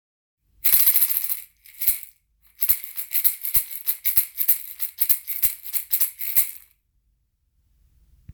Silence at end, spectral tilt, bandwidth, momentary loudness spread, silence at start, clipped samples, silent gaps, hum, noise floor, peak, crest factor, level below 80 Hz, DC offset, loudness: 1.75 s; 1.5 dB/octave; over 20 kHz; 10 LU; 0.65 s; under 0.1%; none; none; -68 dBFS; 0 dBFS; 24 dB; -56 dBFS; under 0.1%; -19 LUFS